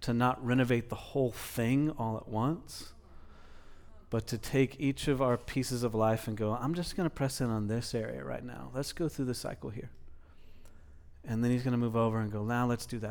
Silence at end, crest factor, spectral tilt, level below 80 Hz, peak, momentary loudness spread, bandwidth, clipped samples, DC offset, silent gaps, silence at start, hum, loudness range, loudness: 0 s; 18 dB; -6.5 dB/octave; -52 dBFS; -16 dBFS; 11 LU; over 20 kHz; under 0.1%; under 0.1%; none; 0 s; none; 5 LU; -33 LUFS